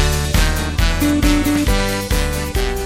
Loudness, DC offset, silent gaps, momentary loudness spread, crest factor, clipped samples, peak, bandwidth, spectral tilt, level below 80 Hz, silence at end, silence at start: -17 LUFS; under 0.1%; none; 5 LU; 14 dB; under 0.1%; -2 dBFS; 17 kHz; -4.5 dB/octave; -20 dBFS; 0 s; 0 s